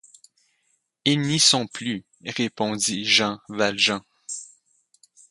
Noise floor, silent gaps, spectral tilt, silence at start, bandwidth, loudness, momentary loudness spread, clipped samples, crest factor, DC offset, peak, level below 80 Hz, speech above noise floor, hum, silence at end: -71 dBFS; none; -2.5 dB/octave; 1.05 s; 11.5 kHz; -22 LUFS; 16 LU; under 0.1%; 22 dB; under 0.1%; -4 dBFS; -66 dBFS; 48 dB; none; 0.85 s